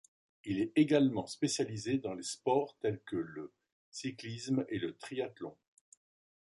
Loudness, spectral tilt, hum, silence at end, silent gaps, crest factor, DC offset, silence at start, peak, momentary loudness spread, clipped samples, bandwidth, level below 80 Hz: -35 LUFS; -5 dB/octave; none; 0.9 s; 3.72-3.92 s; 20 dB; under 0.1%; 0.45 s; -16 dBFS; 18 LU; under 0.1%; 11.5 kHz; -72 dBFS